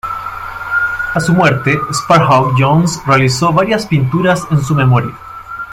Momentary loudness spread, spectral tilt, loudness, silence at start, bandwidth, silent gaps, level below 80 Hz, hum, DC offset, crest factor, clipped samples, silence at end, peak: 13 LU; -6 dB/octave; -12 LUFS; 0.05 s; 15.5 kHz; none; -40 dBFS; none; under 0.1%; 12 dB; under 0.1%; 0 s; 0 dBFS